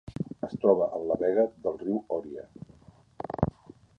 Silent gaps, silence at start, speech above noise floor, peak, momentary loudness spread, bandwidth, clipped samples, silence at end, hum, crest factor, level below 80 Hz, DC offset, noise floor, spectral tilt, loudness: none; 0.05 s; 29 dB; -6 dBFS; 18 LU; 6.8 kHz; under 0.1%; 0.5 s; none; 24 dB; -54 dBFS; under 0.1%; -56 dBFS; -10 dB/octave; -29 LUFS